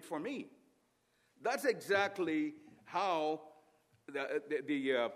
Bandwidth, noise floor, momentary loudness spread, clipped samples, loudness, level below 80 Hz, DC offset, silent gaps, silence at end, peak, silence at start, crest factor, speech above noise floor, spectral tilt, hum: 15 kHz; -76 dBFS; 12 LU; under 0.1%; -37 LUFS; -90 dBFS; under 0.1%; none; 0 s; -18 dBFS; 0 s; 20 dB; 40 dB; -4 dB/octave; none